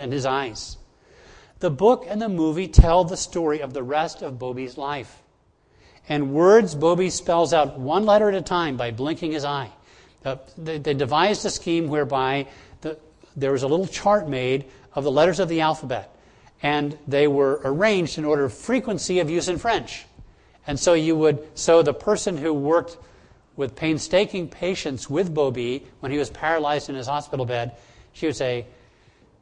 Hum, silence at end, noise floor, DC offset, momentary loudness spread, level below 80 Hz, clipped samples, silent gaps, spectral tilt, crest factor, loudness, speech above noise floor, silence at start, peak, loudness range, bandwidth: none; 0.7 s; -61 dBFS; under 0.1%; 13 LU; -34 dBFS; under 0.1%; none; -5 dB/octave; 22 dB; -22 LUFS; 39 dB; 0 s; 0 dBFS; 5 LU; 10.5 kHz